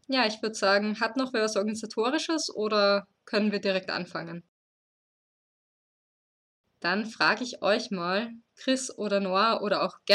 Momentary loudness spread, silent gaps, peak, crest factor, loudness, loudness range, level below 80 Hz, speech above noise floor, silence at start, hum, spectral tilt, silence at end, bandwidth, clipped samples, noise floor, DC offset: 8 LU; 4.48-6.64 s; -8 dBFS; 20 dB; -27 LUFS; 9 LU; -80 dBFS; over 62 dB; 0.1 s; none; -3.5 dB/octave; 0 s; 12 kHz; under 0.1%; under -90 dBFS; under 0.1%